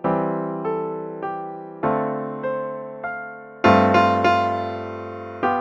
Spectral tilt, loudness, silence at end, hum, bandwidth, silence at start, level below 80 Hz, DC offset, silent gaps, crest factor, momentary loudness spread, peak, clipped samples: -7 dB/octave; -22 LUFS; 0 s; none; 7.8 kHz; 0 s; -58 dBFS; under 0.1%; none; 20 dB; 15 LU; -2 dBFS; under 0.1%